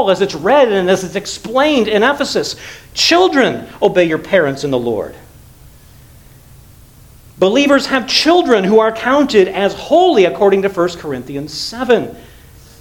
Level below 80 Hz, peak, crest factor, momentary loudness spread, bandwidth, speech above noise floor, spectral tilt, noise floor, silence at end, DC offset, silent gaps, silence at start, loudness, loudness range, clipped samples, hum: -46 dBFS; 0 dBFS; 14 dB; 12 LU; 18 kHz; 28 dB; -4 dB/octave; -41 dBFS; 0.6 s; under 0.1%; none; 0 s; -13 LUFS; 7 LU; under 0.1%; none